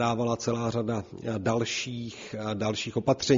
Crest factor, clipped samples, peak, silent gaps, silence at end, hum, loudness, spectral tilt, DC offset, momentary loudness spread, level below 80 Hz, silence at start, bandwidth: 18 dB; under 0.1%; -10 dBFS; none; 0 s; none; -30 LUFS; -5 dB/octave; under 0.1%; 8 LU; -58 dBFS; 0 s; 7.4 kHz